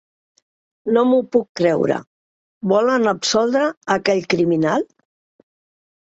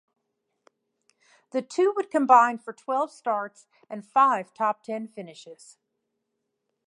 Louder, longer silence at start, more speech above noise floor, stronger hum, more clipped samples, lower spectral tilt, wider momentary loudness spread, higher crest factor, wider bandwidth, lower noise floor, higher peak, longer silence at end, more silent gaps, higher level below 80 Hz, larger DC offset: first, -18 LUFS vs -24 LUFS; second, 0.85 s vs 1.55 s; first, over 73 dB vs 55 dB; neither; neither; about the same, -5 dB/octave vs -4.5 dB/octave; second, 7 LU vs 22 LU; second, 16 dB vs 24 dB; second, 8.2 kHz vs 11.5 kHz; first, under -90 dBFS vs -80 dBFS; about the same, -2 dBFS vs -4 dBFS; second, 1.2 s vs 1.35 s; first, 1.49-1.55 s, 2.07-2.61 s, 3.77-3.81 s vs none; first, -62 dBFS vs -88 dBFS; neither